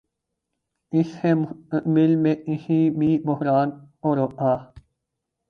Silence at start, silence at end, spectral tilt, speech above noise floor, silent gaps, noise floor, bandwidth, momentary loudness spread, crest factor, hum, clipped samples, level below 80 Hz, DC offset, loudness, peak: 0.9 s; 0.85 s; -10 dB/octave; 60 dB; none; -81 dBFS; 6.4 kHz; 8 LU; 16 dB; none; under 0.1%; -60 dBFS; under 0.1%; -22 LUFS; -8 dBFS